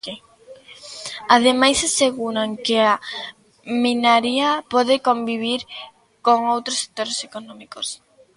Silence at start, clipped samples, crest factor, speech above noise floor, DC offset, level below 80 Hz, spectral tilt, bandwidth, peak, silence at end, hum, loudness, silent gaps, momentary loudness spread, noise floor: 0.05 s; under 0.1%; 20 dB; 27 dB; under 0.1%; -58 dBFS; -2 dB/octave; 11.5 kHz; 0 dBFS; 0.4 s; none; -19 LUFS; none; 19 LU; -46 dBFS